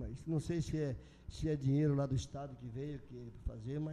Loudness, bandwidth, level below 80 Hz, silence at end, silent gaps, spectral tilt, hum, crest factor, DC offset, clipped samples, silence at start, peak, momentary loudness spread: -39 LUFS; 10.5 kHz; -52 dBFS; 0 s; none; -7.5 dB/octave; none; 14 dB; under 0.1%; under 0.1%; 0 s; -24 dBFS; 15 LU